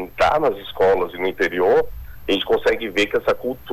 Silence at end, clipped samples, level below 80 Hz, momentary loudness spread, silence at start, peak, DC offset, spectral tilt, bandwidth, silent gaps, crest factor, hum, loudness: 0 s; under 0.1%; -42 dBFS; 6 LU; 0 s; -10 dBFS; under 0.1%; -4.5 dB/octave; 14 kHz; none; 10 dB; none; -20 LUFS